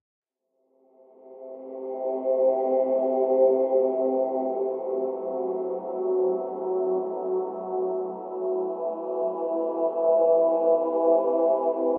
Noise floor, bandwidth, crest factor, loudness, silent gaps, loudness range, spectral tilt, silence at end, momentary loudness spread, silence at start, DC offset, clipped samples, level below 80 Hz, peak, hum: -73 dBFS; 2.8 kHz; 16 dB; -25 LUFS; none; 5 LU; -9 dB/octave; 0 s; 10 LU; 1.25 s; under 0.1%; under 0.1%; under -90 dBFS; -10 dBFS; none